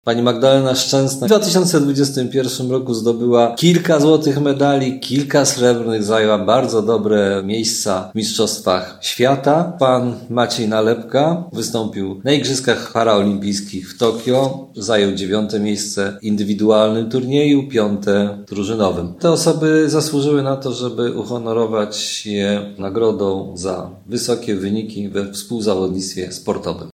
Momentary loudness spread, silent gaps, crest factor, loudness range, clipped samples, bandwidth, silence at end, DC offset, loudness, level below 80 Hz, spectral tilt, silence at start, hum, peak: 9 LU; none; 16 dB; 5 LU; under 0.1%; 16 kHz; 0.05 s; under 0.1%; -17 LUFS; -56 dBFS; -5 dB/octave; 0.05 s; none; 0 dBFS